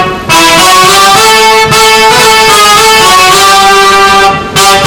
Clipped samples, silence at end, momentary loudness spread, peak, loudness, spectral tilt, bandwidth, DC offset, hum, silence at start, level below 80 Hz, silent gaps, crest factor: 10%; 0 s; 3 LU; 0 dBFS; -2 LUFS; -1.5 dB/octave; over 20 kHz; under 0.1%; none; 0 s; -30 dBFS; none; 4 dB